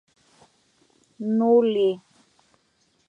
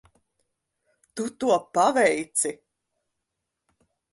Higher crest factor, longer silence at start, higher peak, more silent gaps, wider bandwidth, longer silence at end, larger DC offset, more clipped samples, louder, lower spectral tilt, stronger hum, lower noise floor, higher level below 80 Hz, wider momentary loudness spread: about the same, 18 dB vs 20 dB; about the same, 1.2 s vs 1.15 s; about the same, -8 dBFS vs -8 dBFS; neither; second, 7.2 kHz vs 12 kHz; second, 1.1 s vs 1.6 s; neither; neither; first, -21 LUFS vs -24 LUFS; first, -8 dB/octave vs -2.5 dB/octave; neither; second, -67 dBFS vs -82 dBFS; second, -78 dBFS vs -70 dBFS; about the same, 15 LU vs 13 LU